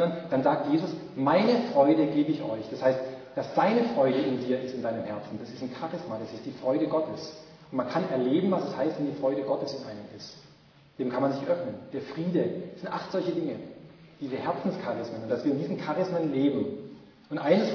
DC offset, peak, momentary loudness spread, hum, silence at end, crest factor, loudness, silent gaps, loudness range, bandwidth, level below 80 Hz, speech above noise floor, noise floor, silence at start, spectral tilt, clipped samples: under 0.1%; -8 dBFS; 14 LU; none; 0 s; 20 dB; -29 LUFS; none; 6 LU; 5.4 kHz; -70 dBFS; 29 dB; -56 dBFS; 0 s; -7.5 dB/octave; under 0.1%